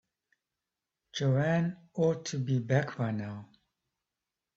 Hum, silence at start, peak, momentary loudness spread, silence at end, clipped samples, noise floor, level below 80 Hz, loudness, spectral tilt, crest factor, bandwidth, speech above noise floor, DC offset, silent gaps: none; 1.15 s; -14 dBFS; 12 LU; 1.1 s; under 0.1%; -89 dBFS; -70 dBFS; -31 LUFS; -6.5 dB/octave; 20 dB; 7.8 kHz; 59 dB; under 0.1%; none